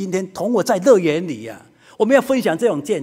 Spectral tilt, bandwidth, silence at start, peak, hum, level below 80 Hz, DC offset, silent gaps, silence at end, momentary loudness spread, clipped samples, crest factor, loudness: -5.5 dB/octave; 16 kHz; 0 s; 0 dBFS; none; -64 dBFS; under 0.1%; none; 0 s; 12 LU; under 0.1%; 18 dB; -17 LUFS